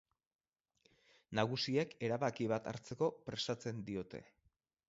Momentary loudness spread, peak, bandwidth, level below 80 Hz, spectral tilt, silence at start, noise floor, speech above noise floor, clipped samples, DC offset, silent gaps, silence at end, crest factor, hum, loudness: 9 LU; -18 dBFS; 7.6 kHz; -74 dBFS; -4.5 dB/octave; 1.3 s; -89 dBFS; 50 dB; under 0.1%; under 0.1%; none; 0.65 s; 22 dB; none; -39 LUFS